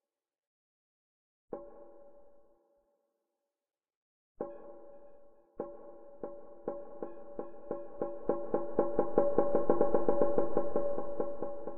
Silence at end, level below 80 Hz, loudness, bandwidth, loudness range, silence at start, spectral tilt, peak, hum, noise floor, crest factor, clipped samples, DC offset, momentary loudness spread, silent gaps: 0 s; -60 dBFS; -34 LUFS; 3.1 kHz; 23 LU; 0 s; -11.5 dB/octave; -12 dBFS; none; under -90 dBFS; 22 dB; under 0.1%; under 0.1%; 20 LU; 0.47-1.48 s, 3.96-4.35 s